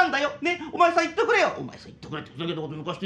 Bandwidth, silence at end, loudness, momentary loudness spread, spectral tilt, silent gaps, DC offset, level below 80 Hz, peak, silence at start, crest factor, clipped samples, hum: 9.4 kHz; 0 s; -24 LUFS; 16 LU; -4.5 dB/octave; none; under 0.1%; -60 dBFS; -6 dBFS; 0 s; 18 dB; under 0.1%; none